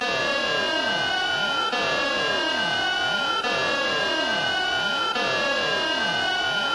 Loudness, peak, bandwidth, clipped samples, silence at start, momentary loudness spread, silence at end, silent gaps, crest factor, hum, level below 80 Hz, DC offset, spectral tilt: -22 LUFS; -10 dBFS; 11 kHz; under 0.1%; 0 s; 0 LU; 0 s; none; 14 dB; none; -56 dBFS; under 0.1%; -2 dB/octave